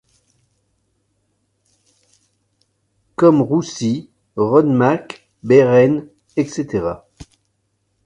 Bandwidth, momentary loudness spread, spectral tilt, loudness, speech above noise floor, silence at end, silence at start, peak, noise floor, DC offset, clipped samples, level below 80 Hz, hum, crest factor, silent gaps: 10.5 kHz; 19 LU; -7 dB/octave; -16 LUFS; 53 dB; 0.85 s; 3.2 s; 0 dBFS; -68 dBFS; under 0.1%; under 0.1%; -54 dBFS; none; 18 dB; none